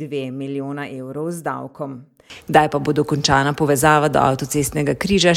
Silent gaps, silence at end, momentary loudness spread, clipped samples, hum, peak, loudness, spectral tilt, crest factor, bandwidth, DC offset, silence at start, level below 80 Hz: none; 0 s; 15 LU; under 0.1%; none; 0 dBFS; -19 LUFS; -4.5 dB/octave; 18 dB; 16.5 kHz; under 0.1%; 0 s; -44 dBFS